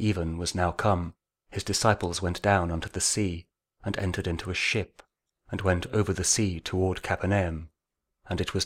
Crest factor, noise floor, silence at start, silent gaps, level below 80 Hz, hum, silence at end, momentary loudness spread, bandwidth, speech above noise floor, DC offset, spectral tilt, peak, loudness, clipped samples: 22 dB; -84 dBFS; 0 s; none; -46 dBFS; none; 0 s; 11 LU; 15.5 kHz; 56 dB; under 0.1%; -4 dB/octave; -6 dBFS; -28 LUFS; under 0.1%